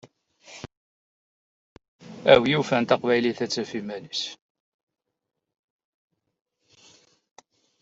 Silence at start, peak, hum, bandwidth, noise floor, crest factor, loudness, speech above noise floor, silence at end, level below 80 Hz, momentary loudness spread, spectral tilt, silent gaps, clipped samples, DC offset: 0.5 s; -2 dBFS; none; 8 kHz; -58 dBFS; 26 dB; -23 LUFS; 35 dB; 3.5 s; -62 dBFS; 25 LU; -5 dB/octave; 0.77-1.76 s, 1.88-1.99 s; under 0.1%; under 0.1%